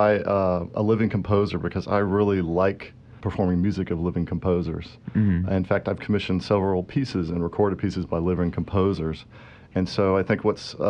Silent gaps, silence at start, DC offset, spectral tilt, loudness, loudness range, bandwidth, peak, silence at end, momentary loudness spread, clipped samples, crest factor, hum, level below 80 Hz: none; 0 s; under 0.1%; -8 dB/octave; -24 LUFS; 2 LU; 9.2 kHz; -6 dBFS; 0 s; 7 LU; under 0.1%; 16 dB; none; -46 dBFS